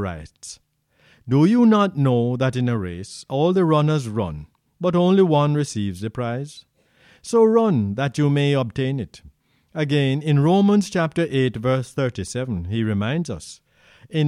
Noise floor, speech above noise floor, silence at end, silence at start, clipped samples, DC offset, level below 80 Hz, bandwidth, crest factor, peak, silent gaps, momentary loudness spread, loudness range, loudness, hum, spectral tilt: -59 dBFS; 39 dB; 0 s; 0 s; under 0.1%; under 0.1%; -52 dBFS; 11.5 kHz; 16 dB; -4 dBFS; none; 15 LU; 2 LU; -20 LUFS; none; -7 dB/octave